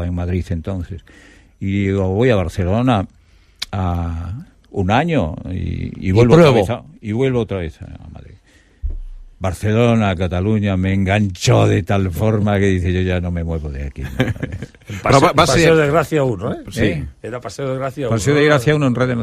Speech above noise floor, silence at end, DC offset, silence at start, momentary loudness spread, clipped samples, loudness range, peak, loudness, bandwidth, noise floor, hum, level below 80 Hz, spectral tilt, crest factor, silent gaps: 32 dB; 0 s; under 0.1%; 0 s; 17 LU; under 0.1%; 5 LU; 0 dBFS; -17 LUFS; 15 kHz; -49 dBFS; none; -34 dBFS; -6.5 dB/octave; 16 dB; none